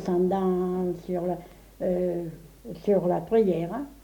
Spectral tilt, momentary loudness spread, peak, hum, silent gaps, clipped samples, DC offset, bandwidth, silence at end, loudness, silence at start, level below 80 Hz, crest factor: -9 dB/octave; 12 LU; -12 dBFS; none; none; under 0.1%; under 0.1%; 19 kHz; 0.1 s; -27 LUFS; 0 s; -54 dBFS; 16 dB